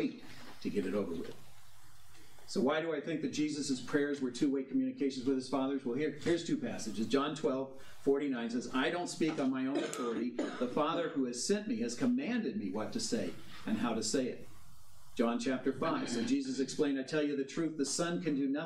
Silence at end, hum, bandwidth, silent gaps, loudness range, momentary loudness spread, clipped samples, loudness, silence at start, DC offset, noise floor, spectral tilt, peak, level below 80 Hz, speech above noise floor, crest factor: 0 s; none; 13.5 kHz; none; 2 LU; 6 LU; under 0.1%; -35 LUFS; 0 s; 0.3%; -62 dBFS; -4.5 dB/octave; -18 dBFS; -70 dBFS; 27 dB; 18 dB